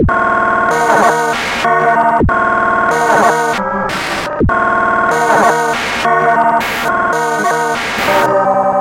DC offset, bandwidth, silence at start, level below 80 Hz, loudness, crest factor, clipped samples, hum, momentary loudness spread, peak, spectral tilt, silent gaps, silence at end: under 0.1%; 17 kHz; 0 s; -32 dBFS; -12 LUFS; 12 dB; under 0.1%; none; 5 LU; 0 dBFS; -4.5 dB/octave; none; 0 s